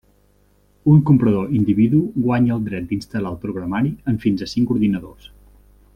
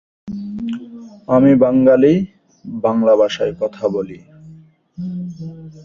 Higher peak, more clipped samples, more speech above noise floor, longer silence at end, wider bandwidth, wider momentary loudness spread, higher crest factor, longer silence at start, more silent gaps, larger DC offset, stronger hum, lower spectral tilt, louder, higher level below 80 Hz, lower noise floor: about the same, -2 dBFS vs -2 dBFS; neither; first, 39 dB vs 29 dB; first, 0.85 s vs 0 s; first, 8.8 kHz vs 7.2 kHz; second, 10 LU vs 20 LU; about the same, 16 dB vs 16 dB; first, 0.85 s vs 0.25 s; neither; neither; first, 50 Hz at -40 dBFS vs none; about the same, -9 dB/octave vs -8 dB/octave; second, -19 LUFS vs -15 LUFS; first, -46 dBFS vs -54 dBFS; first, -57 dBFS vs -44 dBFS